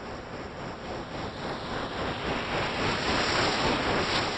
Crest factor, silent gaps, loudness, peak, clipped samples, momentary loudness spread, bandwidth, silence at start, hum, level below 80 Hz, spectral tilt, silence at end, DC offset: 16 dB; none; -29 LUFS; -12 dBFS; under 0.1%; 13 LU; 9.8 kHz; 0 s; none; -46 dBFS; -4 dB/octave; 0 s; under 0.1%